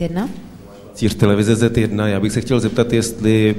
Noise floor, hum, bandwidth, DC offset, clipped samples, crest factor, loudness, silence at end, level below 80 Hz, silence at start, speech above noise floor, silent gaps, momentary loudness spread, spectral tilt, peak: -38 dBFS; none; 15.5 kHz; under 0.1%; under 0.1%; 16 dB; -17 LUFS; 0 s; -40 dBFS; 0 s; 22 dB; none; 10 LU; -6 dB/octave; 0 dBFS